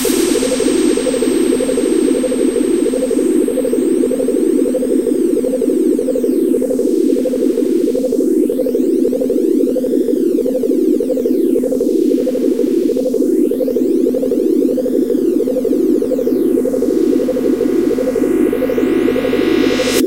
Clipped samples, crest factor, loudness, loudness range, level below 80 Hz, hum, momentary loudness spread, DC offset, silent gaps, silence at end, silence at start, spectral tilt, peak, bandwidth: under 0.1%; 14 dB; -14 LUFS; 0 LU; -48 dBFS; none; 2 LU; 0.9%; none; 0 s; 0 s; -4.5 dB/octave; 0 dBFS; 16 kHz